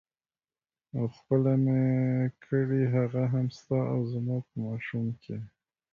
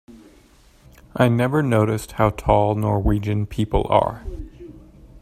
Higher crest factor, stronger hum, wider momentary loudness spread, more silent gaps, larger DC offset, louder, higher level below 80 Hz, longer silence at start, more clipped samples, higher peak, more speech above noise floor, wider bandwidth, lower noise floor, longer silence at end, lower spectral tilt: about the same, 16 dB vs 20 dB; neither; second, 11 LU vs 17 LU; neither; neither; second, -29 LUFS vs -20 LUFS; second, -64 dBFS vs -34 dBFS; first, 0.95 s vs 0.1 s; neither; second, -12 dBFS vs 0 dBFS; first, over 62 dB vs 33 dB; second, 6.8 kHz vs 14.5 kHz; first, under -90 dBFS vs -52 dBFS; first, 0.45 s vs 0.05 s; first, -10 dB/octave vs -7.5 dB/octave